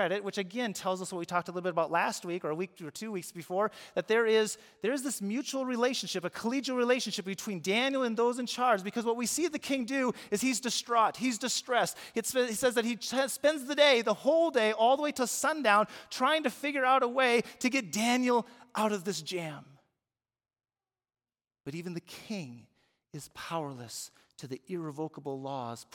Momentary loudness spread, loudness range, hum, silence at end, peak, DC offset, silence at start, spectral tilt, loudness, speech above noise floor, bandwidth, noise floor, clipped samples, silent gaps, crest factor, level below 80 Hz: 14 LU; 14 LU; none; 0.1 s; -10 dBFS; under 0.1%; 0 s; -3 dB/octave; -30 LUFS; over 59 dB; 18 kHz; under -90 dBFS; under 0.1%; none; 22 dB; -78 dBFS